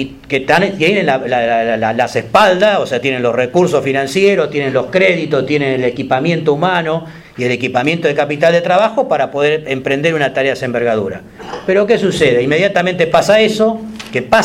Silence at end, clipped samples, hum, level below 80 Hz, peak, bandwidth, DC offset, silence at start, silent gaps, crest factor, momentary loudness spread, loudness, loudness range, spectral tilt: 0 s; under 0.1%; none; -48 dBFS; 0 dBFS; 15 kHz; under 0.1%; 0 s; none; 14 dB; 7 LU; -13 LUFS; 2 LU; -5.5 dB/octave